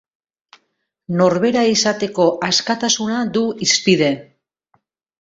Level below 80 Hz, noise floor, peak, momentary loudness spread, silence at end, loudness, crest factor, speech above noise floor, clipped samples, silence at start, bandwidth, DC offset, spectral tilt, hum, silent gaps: -58 dBFS; -70 dBFS; -2 dBFS; 5 LU; 1 s; -16 LUFS; 16 dB; 54 dB; under 0.1%; 1.1 s; 8 kHz; under 0.1%; -3.5 dB/octave; none; none